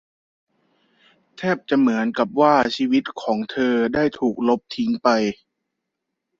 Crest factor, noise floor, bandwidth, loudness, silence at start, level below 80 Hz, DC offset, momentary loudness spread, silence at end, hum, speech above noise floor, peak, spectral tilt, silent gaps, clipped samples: 20 dB; -80 dBFS; 7.6 kHz; -20 LUFS; 1.4 s; -60 dBFS; under 0.1%; 8 LU; 1.05 s; none; 61 dB; -2 dBFS; -6 dB/octave; none; under 0.1%